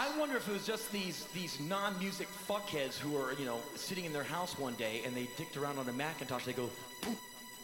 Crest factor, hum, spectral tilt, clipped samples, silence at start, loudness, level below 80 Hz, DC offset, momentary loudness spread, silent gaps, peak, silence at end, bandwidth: 20 dB; none; -3.5 dB/octave; under 0.1%; 0 s; -39 LUFS; -72 dBFS; under 0.1%; 5 LU; none; -20 dBFS; 0 s; 18 kHz